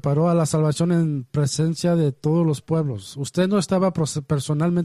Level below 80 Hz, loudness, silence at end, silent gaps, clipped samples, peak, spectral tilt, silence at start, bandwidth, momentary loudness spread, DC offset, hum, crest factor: -54 dBFS; -22 LUFS; 0 s; none; under 0.1%; -8 dBFS; -6.5 dB/octave; 0.05 s; 13 kHz; 5 LU; under 0.1%; none; 12 dB